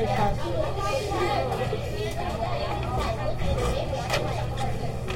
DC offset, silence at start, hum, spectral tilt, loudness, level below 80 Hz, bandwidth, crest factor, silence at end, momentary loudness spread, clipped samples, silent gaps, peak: under 0.1%; 0 s; none; -5.5 dB/octave; -28 LUFS; -36 dBFS; 16.5 kHz; 14 dB; 0 s; 4 LU; under 0.1%; none; -12 dBFS